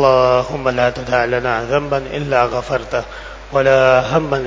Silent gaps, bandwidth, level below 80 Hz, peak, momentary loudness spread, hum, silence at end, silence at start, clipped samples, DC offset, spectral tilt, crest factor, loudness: none; 7.8 kHz; -38 dBFS; 0 dBFS; 9 LU; none; 0 s; 0 s; under 0.1%; under 0.1%; -6 dB/octave; 16 dB; -16 LUFS